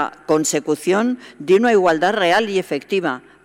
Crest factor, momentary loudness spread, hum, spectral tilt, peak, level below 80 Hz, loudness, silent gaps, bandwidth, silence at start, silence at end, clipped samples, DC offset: 12 dB; 8 LU; none; -4 dB/octave; -6 dBFS; -62 dBFS; -18 LUFS; none; 16 kHz; 0 s; 0.25 s; under 0.1%; under 0.1%